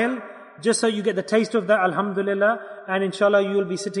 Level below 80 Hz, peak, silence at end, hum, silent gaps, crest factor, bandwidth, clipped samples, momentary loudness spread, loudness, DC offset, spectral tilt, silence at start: -76 dBFS; -6 dBFS; 0 s; none; none; 16 dB; 11 kHz; under 0.1%; 8 LU; -22 LUFS; under 0.1%; -4.5 dB/octave; 0 s